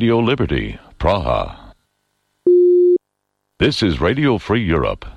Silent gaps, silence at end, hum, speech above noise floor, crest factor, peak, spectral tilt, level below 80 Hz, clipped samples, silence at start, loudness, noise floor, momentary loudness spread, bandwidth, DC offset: none; 0 s; 50 Hz at -50 dBFS; 56 dB; 14 dB; -2 dBFS; -7 dB/octave; -32 dBFS; under 0.1%; 0 s; -16 LUFS; -73 dBFS; 10 LU; 9.6 kHz; under 0.1%